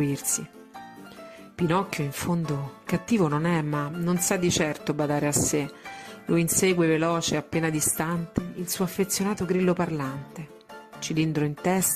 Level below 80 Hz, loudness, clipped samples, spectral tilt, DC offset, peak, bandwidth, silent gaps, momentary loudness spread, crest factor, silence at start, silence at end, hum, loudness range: -54 dBFS; -26 LUFS; under 0.1%; -4.5 dB/octave; under 0.1%; -10 dBFS; 15.5 kHz; none; 20 LU; 16 dB; 0 s; 0 s; none; 3 LU